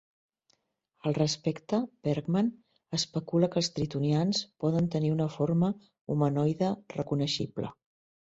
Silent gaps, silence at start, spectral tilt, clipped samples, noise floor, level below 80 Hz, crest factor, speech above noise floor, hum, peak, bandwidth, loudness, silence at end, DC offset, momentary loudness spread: 6.01-6.05 s; 1.05 s; -6 dB/octave; under 0.1%; -75 dBFS; -64 dBFS; 18 dB; 46 dB; none; -12 dBFS; 8 kHz; -30 LUFS; 0.55 s; under 0.1%; 7 LU